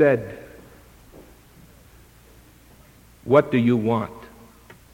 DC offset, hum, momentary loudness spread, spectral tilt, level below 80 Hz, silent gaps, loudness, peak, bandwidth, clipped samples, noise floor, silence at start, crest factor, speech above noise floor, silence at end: under 0.1%; none; 24 LU; -8 dB/octave; -54 dBFS; none; -21 LUFS; -2 dBFS; 17 kHz; under 0.1%; -51 dBFS; 0 s; 24 dB; 32 dB; 0.7 s